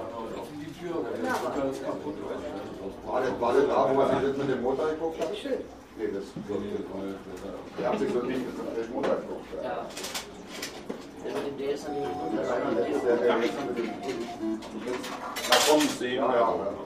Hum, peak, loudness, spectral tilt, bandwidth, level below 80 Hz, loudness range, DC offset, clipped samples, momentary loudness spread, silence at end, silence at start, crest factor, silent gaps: none; -6 dBFS; -29 LUFS; -4 dB/octave; 15.5 kHz; -58 dBFS; 7 LU; under 0.1%; under 0.1%; 14 LU; 0 s; 0 s; 24 dB; none